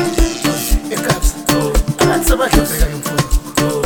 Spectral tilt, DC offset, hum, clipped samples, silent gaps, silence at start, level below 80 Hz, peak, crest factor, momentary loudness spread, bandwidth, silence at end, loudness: -4.5 dB/octave; 0.7%; none; under 0.1%; none; 0 s; -18 dBFS; 0 dBFS; 14 dB; 5 LU; over 20 kHz; 0 s; -16 LUFS